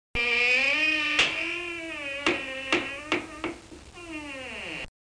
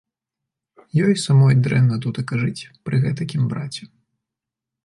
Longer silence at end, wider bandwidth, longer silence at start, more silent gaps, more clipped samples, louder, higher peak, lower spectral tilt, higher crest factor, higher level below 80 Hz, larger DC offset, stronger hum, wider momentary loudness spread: second, 0.1 s vs 1 s; about the same, 10.5 kHz vs 11 kHz; second, 0.15 s vs 0.95 s; neither; neither; second, -26 LUFS vs -19 LUFS; second, -12 dBFS vs -6 dBFS; second, -2 dB/octave vs -7 dB/octave; about the same, 16 dB vs 14 dB; first, -52 dBFS vs -58 dBFS; neither; neither; first, 17 LU vs 13 LU